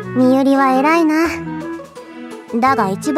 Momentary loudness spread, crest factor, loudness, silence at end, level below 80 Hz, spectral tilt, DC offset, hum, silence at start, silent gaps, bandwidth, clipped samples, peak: 20 LU; 12 dB; -15 LUFS; 0 s; -50 dBFS; -6 dB/octave; under 0.1%; none; 0 s; none; 14 kHz; under 0.1%; -2 dBFS